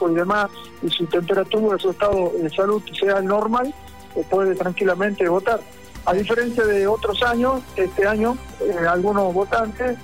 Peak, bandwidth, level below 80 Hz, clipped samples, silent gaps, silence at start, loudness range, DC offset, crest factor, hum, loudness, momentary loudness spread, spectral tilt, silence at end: -10 dBFS; 16 kHz; -44 dBFS; under 0.1%; none; 0 s; 1 LU; 0.5%; 10 dB; none; -21 LUFS; 6 LU; -5.5 dB/octave; 0 s